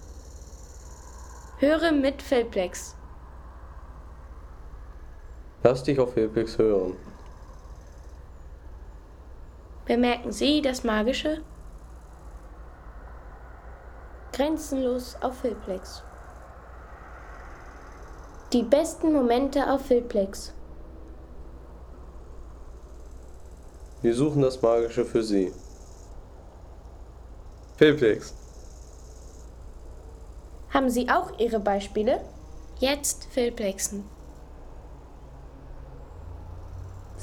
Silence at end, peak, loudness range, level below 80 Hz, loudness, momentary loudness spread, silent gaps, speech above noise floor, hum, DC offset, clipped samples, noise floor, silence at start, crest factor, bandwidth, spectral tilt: 0 s; -6 dBFS; 10 LU; -44 dBFS; -25 LUFS; 24 LU; none; 21 dB; none; under 0.1%; under 0.1%; -45 dBFS; 0 s; 22 dB; 18.5 kHz; -5 dB/octave